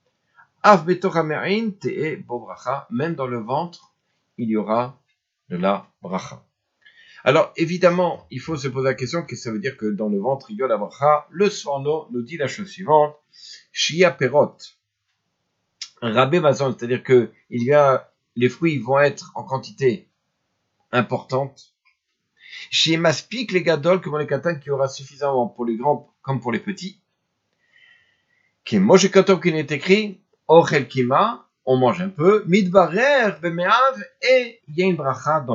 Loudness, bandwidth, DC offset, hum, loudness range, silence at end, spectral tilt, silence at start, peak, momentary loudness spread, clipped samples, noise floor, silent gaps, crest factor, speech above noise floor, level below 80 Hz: -20 LUFS; 7.8 kHz; under 0.1%; none; 9 LU; 0 s; -5.5 dB/octave; 0.65 s; 0 dBFS; 14 LU; under 0.1%; -74 dBFS; none; 20 dB; 55 dB; -70 dBFS